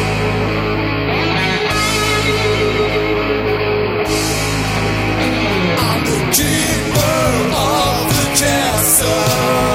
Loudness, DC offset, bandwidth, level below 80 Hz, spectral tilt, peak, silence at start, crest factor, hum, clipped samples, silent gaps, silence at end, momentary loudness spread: -15 LUFS; under 0.1%; 16.5 kHz; -30 dBFS; -3.5 dB/octave; 0 dBFS; 0 s; 14 dB; none; under 0.1%; none; 0 s; 4 LU